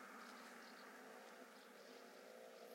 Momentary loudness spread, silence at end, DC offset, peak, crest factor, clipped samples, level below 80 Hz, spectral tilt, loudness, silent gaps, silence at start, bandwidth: 3 LU; 0 s; under 0.1%; -46 dBFS; 14 dB; under 0.1%; under -90 dBFS; -2.5 dB/octave; -59 LUFS; none; 0 s; 16.5 kHz